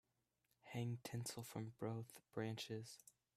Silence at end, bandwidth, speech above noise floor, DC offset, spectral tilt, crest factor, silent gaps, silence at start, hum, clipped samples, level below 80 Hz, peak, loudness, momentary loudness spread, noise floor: 0.25 s; 15 kHz; 37 dB; under 0.1%; -5 dB/octave; 18 dB; none; 0.65 s; none; under 0.1%; -82 dBFS; -32 dBFS; -50 LUFS; 8 LU; -86 dBFS